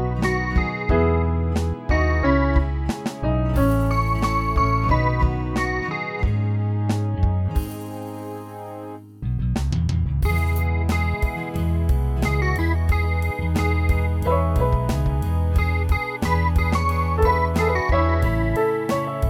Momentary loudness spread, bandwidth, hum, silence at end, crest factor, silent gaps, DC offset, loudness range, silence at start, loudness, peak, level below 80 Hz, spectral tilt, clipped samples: 7 LU; 16 kHz; none; 0 s; 14 dB; none; under 0.1%; 5 LU; 0 s; -22 LUFS; -6 dBFS; -26 dBFS; -7.5 dB/octave; under 0.1%